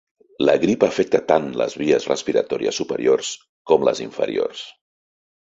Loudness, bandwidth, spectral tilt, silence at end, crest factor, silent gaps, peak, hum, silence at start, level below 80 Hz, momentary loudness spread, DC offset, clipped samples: -20 LUFS; 8 kHz; -4.5 dB/octave; 0.7 s; 18 dB; 3.49-3.65 s; -2 dBFS; none; 0.4 s; -60 dBFS; 8 LU; under 0.1%; under 0.1%